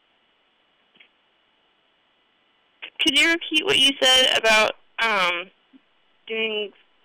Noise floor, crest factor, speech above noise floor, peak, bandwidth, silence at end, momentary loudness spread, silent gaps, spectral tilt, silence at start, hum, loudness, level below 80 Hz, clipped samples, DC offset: -65 dBFS; 12 dB; 45 dB; -12 dBFS; over 20 kHz; 0.35 s; 18 LU; none; -0.5 dB/octave; 2.8 s; none; -19 LUFS; -60 dBFS; under 0.1%; under 0.1%